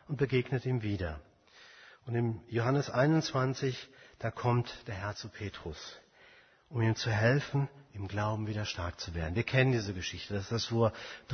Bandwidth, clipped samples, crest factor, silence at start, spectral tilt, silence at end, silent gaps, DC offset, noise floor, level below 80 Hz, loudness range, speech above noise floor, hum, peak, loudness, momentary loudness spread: 6.6 kHz; under 0.1%; 20 dB; 0.1 s; -6 dB/octave; 0 s; none; under 0.1%; -61 dBFS; -56 dBFS; 4 LU; 28 dB; none; -12 dBFS; -33 LUFS; 15 LU